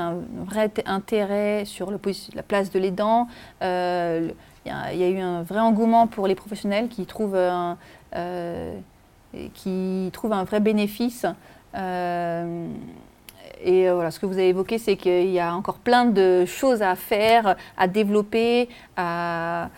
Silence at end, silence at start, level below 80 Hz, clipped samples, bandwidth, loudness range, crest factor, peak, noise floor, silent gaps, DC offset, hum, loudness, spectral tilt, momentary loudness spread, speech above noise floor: 0 s; 0 s; -56 dBFS; under 0.1%; 17 kHz; 7 LU; 18 dB; -6 dBFS; -46 dBFS; none; under 0.1%; none; -23 LUFS; -6 dB/octave; 13 LU; 23 dB